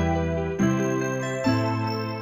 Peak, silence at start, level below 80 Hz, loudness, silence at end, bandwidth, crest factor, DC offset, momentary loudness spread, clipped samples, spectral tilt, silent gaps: -10 dBFS; 0 s; -42 dBFS; -25 LUFS; 0 s; 16 kHz; 14 dB; under 0.1%; 4 LU; under 0.1%; -6.5 dB/octave; none